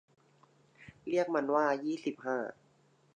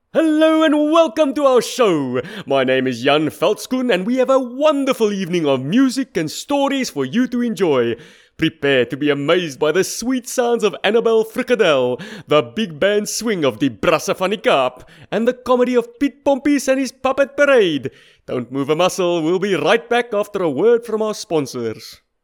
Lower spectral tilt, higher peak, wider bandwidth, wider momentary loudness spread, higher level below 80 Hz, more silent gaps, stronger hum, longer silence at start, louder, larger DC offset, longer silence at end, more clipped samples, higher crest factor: about the same, -5.5 dB/octave vs -4.5 dB/octave; second, -16 dBFS vs 0 dBFS; second, 9.6 kHz vs 19 kHz; about the same, 10 LU vs 8 LU; second, -78 dBFS vs -56 dBFS; neither; neither; first, 0.8 s vs 0.15 s; second, -33 LUFS vs -17 LUFS; neither; first, 0.65 s vs 0.3 s; neither; about the same, 20 dB vs 16 dB